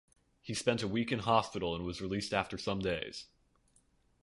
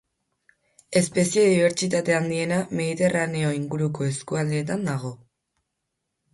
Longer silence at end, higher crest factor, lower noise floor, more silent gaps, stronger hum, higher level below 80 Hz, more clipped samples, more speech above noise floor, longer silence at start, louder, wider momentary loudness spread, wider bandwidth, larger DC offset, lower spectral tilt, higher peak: second, 1 s vs 1.15 s; first, 24 dB vs 16 dB; second, -71 dBFS vs -80 dBFS; neither; neither; first, -58 dBFS vs -64 dBFS; neither; second, 36 dB vs 57 dB; second, 0.45 s vs 0.9 s; second, -35 LUFS vs -23 LUFS; about the same, 10 LU vs 8 LU; about the same, 11.5 kHz vs 11.5 kHz; neither; about the same, -5 dB/octave vs -5 dB/octave; second, -12 dBFS vs -8 dBFS